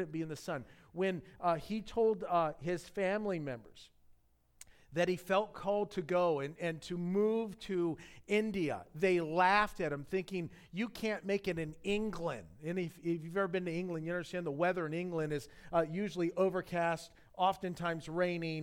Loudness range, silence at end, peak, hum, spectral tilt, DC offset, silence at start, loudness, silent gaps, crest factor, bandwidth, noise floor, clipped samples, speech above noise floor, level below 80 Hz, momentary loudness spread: 4 LU; 0 s; -16 dBFS; none; -6 dB/octave; under 0.1%; 0 s; -36 LUFS; none; 20 dB; 16.5 kHz; -68 dBFS; under 0.1%; 33 dB; -62 dBFS; 9 LU